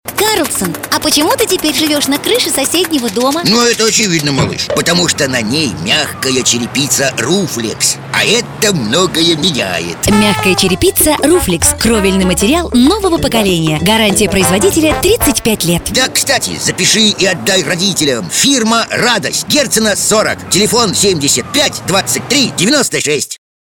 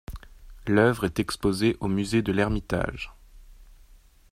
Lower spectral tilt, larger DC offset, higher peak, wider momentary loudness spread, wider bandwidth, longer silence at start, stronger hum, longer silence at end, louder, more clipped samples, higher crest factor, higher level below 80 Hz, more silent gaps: second, -3 dB/octave vs -6 dB/octave; neither; first, 0 dBFS vs -4 dBFS; second, 4 LU vs 17 LU; first, over 20 kHz vs 16 kHz; about the same, 0.05 s vs 0.1 s; neither; second, 0.25 s vs 0.7 s; first, -11 LUFS vs -25 LUFS; neither; second, 12 dB vs 22 dB; first, -32 dBFS vs -42 dBFS; neither